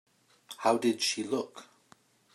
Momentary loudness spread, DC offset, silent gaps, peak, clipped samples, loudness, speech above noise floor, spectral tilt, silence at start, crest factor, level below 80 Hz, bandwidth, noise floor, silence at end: 20 LU; under 0.1%; none; -12 dBFS; under 0.1%; -30 LUFS; 34 dB; -3 dB/octave; 0.5 s; 22 dB; -88 dBFS; 15.5 kHz; -63 dBFS; 0.7 s